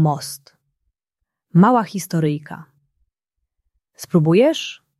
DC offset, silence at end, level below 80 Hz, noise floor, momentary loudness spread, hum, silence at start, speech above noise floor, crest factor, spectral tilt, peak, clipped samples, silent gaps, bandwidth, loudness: under 0.1%; 0.25 s; -64 dBFS; -80 dBFS; 22 LU; none; 0 s; 63 dB; 18 dB; -6.5 dB/octave; -2 dBFS; under 0.1%; none; 13.5 kHz; -18 LUFS